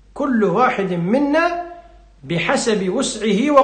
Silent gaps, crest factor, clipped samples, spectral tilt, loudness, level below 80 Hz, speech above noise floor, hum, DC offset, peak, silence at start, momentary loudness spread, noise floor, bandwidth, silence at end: none; 16 dB; under 0.1%; -5 dB/octave; -18 LUFS; -50 dBFS; 26 dB; none; under 0.1%; 0 dBFS; 0.15 s; 6 LU; -43 dBFS; 9.8 kHz; 0 s